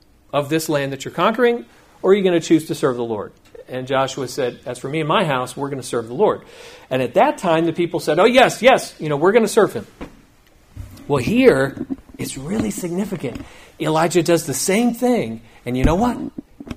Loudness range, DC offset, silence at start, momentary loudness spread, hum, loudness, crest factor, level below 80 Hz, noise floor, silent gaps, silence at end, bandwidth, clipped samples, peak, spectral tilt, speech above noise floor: 5 LU; under 0.1%; 0.35 s; 15 LU; none; -18 LUFS; 18 dB; -40 dBFS; -51 dBFS; none; 0 s; 15.5 kHz; under 0.1%; 0 dBFS; -5 dB/octave; 33 dB